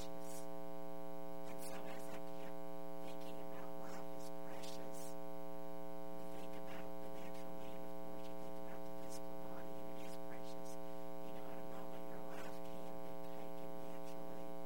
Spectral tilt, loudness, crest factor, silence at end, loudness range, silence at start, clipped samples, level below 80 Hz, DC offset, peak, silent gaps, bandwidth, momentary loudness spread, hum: -5 dB/octave; -51 LUFS; 16 dB; 0 s; 0 LU; 0 s; under 0.1%; -72 dBFS; 1%; -32 dBFS; none; 16 kHz; 1 LU; none